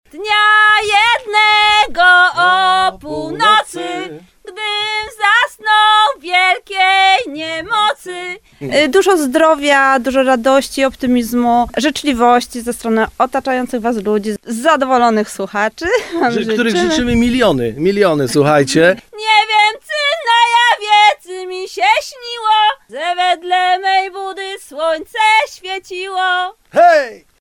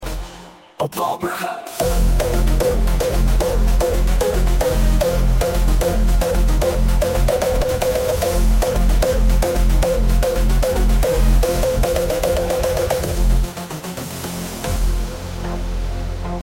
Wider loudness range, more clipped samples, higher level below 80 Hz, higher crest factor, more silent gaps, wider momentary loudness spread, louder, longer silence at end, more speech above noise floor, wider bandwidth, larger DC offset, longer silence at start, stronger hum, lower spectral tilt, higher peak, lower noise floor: about the same, 4 LU vs 3 LU; neither; second, -44 dBFS vs -18 dBFS; about the same, 14 dB vs 12 dB; neither; first, 13 LU vs 8 LU; first, -13 LUFS vs -19 LUFS; first, 0.25 s vs 0 s; about the same, 20 dB vs 21 dB; about the same, 17.5 kHz vs 16.5 kHz; neither; first, 0.15 s vs 0 s; neither; second, -3.5 dB/octave vs -5.5 dB/octave; first, 0 dBFS vs -4 dBFS; second, -34 dBFS vs -40 dBFS